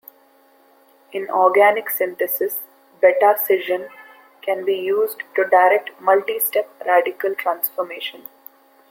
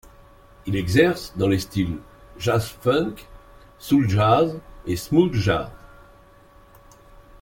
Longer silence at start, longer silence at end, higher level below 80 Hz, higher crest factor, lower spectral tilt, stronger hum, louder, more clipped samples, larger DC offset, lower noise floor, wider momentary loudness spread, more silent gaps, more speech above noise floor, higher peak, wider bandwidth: first, 1.15 s vs 0.65 s; second, 0.75 s vs 1.55 s; second, -74 dBFS vs -46 dBFS; about the same, 18 dB vs 20 dB; second, -2.5 dB/octave vs -6.5 dB/octave; neither; first, -19 LUFS vs -22 LUFS; neither; neither; first, -54 dBFS vs -50 dBFS; about the same, 15 LU vs 17 LU; neither; first, 36 dB vs 30 dB; about the same, -2 dBFS vs -2 dBFS; about the same, 17 kHz vs 17 kHz